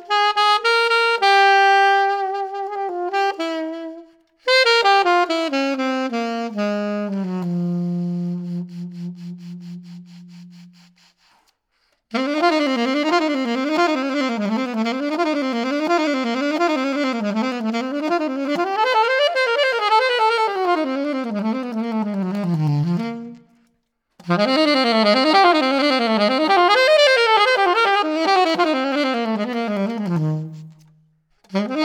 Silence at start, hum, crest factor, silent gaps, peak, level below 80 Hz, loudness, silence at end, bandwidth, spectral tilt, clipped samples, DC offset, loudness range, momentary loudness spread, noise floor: 0 s; none; 16 dB; none; -4 dBFS; -72 dBFS; -18 LUFS; 0 s; 16.5 kHz; -5 dB/octave; under 0.1%; under 0.1%; 10 LU; 13 LU; -69 dBFS